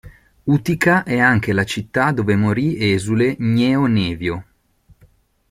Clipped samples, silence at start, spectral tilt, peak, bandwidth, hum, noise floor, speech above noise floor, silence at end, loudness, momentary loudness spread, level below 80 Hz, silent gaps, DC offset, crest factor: under 0.1%; 0.05 s; -6.5 dB/octave; -2 dBFS; 16 kHz; none; -54 dBFS; 37 dB; 1.1 s; -17 LUFS; 7 LU; -48 dBFS; none; under 0.1%; 16 dB